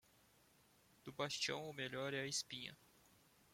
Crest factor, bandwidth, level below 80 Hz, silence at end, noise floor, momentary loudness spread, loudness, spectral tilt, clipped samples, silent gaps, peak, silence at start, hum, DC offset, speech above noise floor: 20 dB; 16.5 kHz; -82 dBFS; 0.7 s; -73 dBFS; 13 LU; -44 LUFS; -2.5 dB/octave; under 0.1%; none; -28 dBFS; 1.05 s; none; under 0.1%; 27 dB